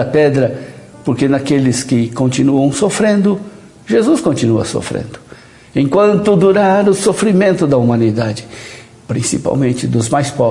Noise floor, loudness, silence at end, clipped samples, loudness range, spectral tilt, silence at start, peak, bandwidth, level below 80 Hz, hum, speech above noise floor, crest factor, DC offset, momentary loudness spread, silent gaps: -39 dBFS; -13 LUFS; 0 s; under 0.1%; 3 LU; -6 dB/octave; 0 s; 0 dBFS; 11.5 kHz; -48 dBFS; none; 26 dB; 12 dB; under 0.1%; 12 LU; none